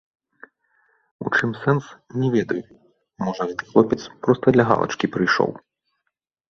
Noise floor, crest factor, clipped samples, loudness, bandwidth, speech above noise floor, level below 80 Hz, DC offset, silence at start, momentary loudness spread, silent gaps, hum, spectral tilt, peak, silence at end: -78 dBFS; 22 dB; under 0.1%; -21 LUFS; 7.2 kHz; 58 dB; -58 dBFS; under 0.1%; 1.2 s; 11 LU; none; none; -6.5 dB/octave; 0 dBFS; 0.95 s